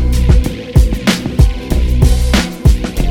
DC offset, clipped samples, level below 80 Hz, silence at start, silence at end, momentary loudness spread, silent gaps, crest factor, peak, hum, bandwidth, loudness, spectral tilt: under 0.1%; under 0.1%; -12 dBFS; 0 s; 0 s; 3 LU; none; 10 dB; 0 dBFS; none; 16 kHz; -13 LUFS; -6 dB/octave